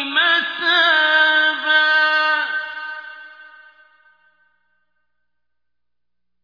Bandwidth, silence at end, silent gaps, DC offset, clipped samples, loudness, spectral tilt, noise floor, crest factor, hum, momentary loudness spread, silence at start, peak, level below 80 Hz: 5.2 kHz; 2.95 s; none; under 0.1%; under 0.1%; -15 LUFS; -0.5 dB/octave; -85 dBFS; 16 dB; 60 Hz at -85 dBFS; 16 LU; 0 s; -4 dBFS; -74 dBFS